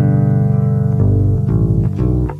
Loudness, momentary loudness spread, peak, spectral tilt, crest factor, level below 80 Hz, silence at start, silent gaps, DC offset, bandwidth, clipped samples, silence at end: -15 LUFS; 2 LU; -4 dBFS; -12 dB/octave; 10 dB; -26 dBFS; 0 s; none; under 0.1%; 2.7 kHz; under 0.1%; 0 s